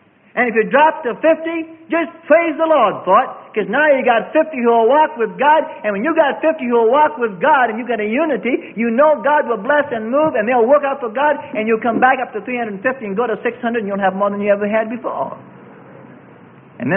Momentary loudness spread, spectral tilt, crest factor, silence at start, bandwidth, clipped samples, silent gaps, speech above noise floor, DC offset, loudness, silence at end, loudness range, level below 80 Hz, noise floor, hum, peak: 9 LU; -11 dB/octave; 16 dB; 0.35 s; 3.6 kHz; under 0.1%; none; 27 dB; under 0.1%; -16 LUFS; 0 s; 5 LU; -64 dBFS; -42 dBFS; none; 0 dBFS